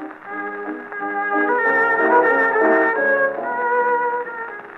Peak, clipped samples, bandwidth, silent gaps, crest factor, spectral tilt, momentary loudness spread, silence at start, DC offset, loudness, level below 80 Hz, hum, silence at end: -4 dBFS; under 0.1%; 5.8 kHz; none; 14 dB; -6.5 dB/octave; 14 LU; 0 s; under 0.1%; -18 LUFS; -74 dBFS; none; 0 s